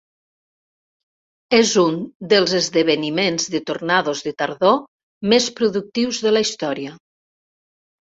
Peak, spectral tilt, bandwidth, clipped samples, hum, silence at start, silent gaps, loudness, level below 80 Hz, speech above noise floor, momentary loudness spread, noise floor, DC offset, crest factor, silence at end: -2 dBFS; -3.5 dB/octave; 8 kHz; under 0.1%; none; 1.5 s; 2.15-2.20 s, 4.88-5.21 s; -19 LUFS; -62 dBFS; over 72 dB; 9 LU; under -90 dBFS; under 0.1%; 18 dB; 1.2 s